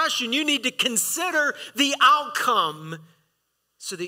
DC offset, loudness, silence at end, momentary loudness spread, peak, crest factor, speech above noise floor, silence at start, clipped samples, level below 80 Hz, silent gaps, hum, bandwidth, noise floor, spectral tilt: under 0.1%; -21 LUFS; 0 s; 19 LU; -6 dBFS; 18 dB; 51 dB; 0 s; under 0.1%; -76 dBFS; none; none; 16 kHz; -74 dBFS; -1 dB/octave